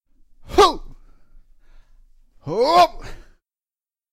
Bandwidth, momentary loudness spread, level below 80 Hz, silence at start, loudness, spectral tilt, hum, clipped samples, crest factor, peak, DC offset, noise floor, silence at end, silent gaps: 16 kHz; 22 LU; -40 dBFS; 0.5 s; -17 LUFS; -4 dB/octave; none; under 0.1%; 20 dB; -2 dBFS; under 0.1%; under -90 dBFS; 0.9 s; none